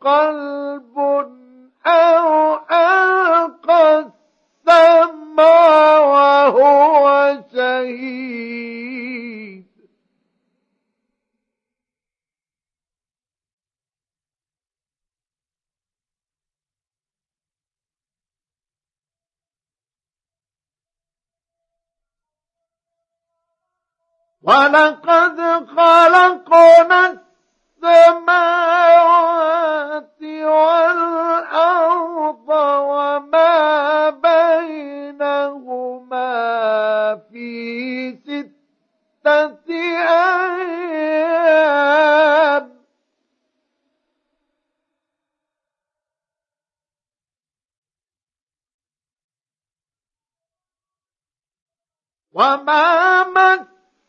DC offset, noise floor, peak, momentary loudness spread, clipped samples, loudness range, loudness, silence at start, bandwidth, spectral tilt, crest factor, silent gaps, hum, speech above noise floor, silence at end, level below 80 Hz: under 0.1%; under -90 dBFS; 0 dBFS; 17 LU; under 0.1%; 11 LU; -13 LUFS; 0.05 s; 8 kHz; -3.5 dB/octave; 16 dB; 13.53-13.58 s, 47.78-47.82 s, 48.43-48.47 s, 48.74-48.79 s, 49.24-49.29 s, 51.62-51.66 s; none; over 79 dB; 0.45 s; -74 dBFS